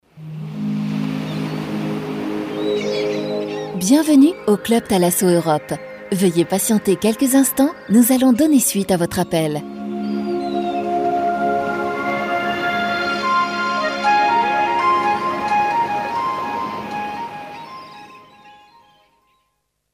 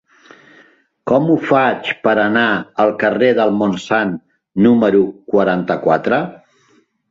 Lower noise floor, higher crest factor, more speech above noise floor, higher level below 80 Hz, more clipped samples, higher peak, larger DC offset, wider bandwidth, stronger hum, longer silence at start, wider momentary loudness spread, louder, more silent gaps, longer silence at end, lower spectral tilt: first, -70 dBFS vs -56 dBFS; about the same, 16 dB vs 14 dB; first, 55 dB vs 42 dB; about the same, -56 dBFS vs -56 dBFS; neither; about the same, -2 dBFS vs -2 dBFS; neither; first, 16 kHz vs 7.6 kHz; neither; second, 0.15 s vs 1.05 s; first, 12 LU vs 6 LU; second, -18 LUFS vs -15 LUFS; neither; first, 1.4 s vs 0.75 s; second, -4.5 dB/octave vs -7 dB/octave